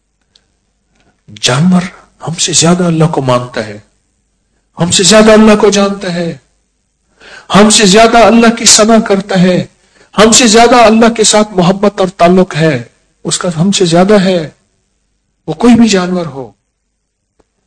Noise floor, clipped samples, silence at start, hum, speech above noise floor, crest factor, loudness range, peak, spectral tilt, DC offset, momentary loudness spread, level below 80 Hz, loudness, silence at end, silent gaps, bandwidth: -65 dBFS; 6%; 1.3 s; none; 58 dB; 8 dB; 6 LU; 0 dBFS; -4 dB/octave; under 0.1%; 16 LU; -38 dBFS; -7 LUFS; 1.2 s; none; 11 kHz